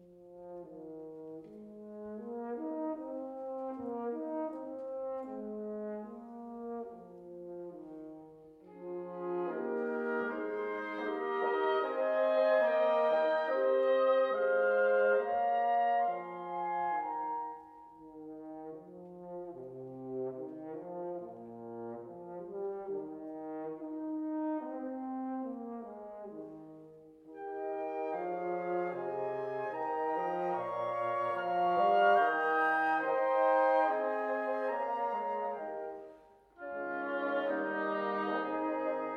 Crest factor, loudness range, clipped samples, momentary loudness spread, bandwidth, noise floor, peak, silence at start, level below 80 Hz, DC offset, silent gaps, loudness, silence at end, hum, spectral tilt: 18 dB; 14 LU; under 0.1%; 19 LU; 5.8 kHz; -59 dBFS; -16 dBFS; 0 s; -80 dBFS; under 0.1%; none; -34 LUFS; 0 s; none; -7 dB/octave